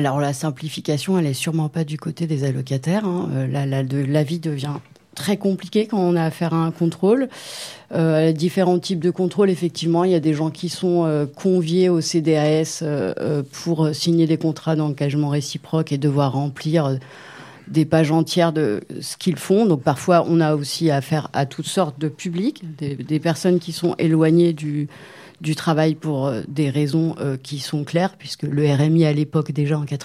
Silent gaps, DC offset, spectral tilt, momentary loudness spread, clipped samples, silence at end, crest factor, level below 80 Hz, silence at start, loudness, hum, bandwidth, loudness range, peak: none; under 0.1%; -6.5 dB/octave; 9 LU; under 0.1%; 0 s; 18 dB; -64 dBFS; 0 s; -20 LUFS; none; 15 kHz; 3 LU; -2 dBFS